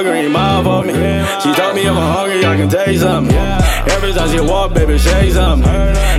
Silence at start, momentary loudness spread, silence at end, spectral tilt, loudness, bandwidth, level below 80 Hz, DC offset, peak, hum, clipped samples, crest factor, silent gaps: 0 s; 2 LU; 0 s; -5.5 dB/octave; -13 LUFS; 15.5 kHz; -16 dBFS; under 0.1%; 0 dBFS; none; under 0.1%; 12 dB; none